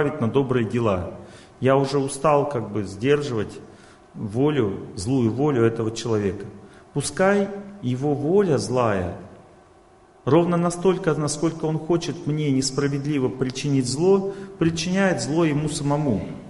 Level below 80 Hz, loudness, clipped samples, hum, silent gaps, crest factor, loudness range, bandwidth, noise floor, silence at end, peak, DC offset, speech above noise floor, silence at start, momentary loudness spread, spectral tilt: -50 dBFS; -23 LUFS; under 0.1%; none; none; 18 dB; 2 LU; 11.5 kHz; -52 dBFS; 0 s; -4 dBFS; under 0.1%; 30 dB; 0 s; 10 LU; -6 dB/octave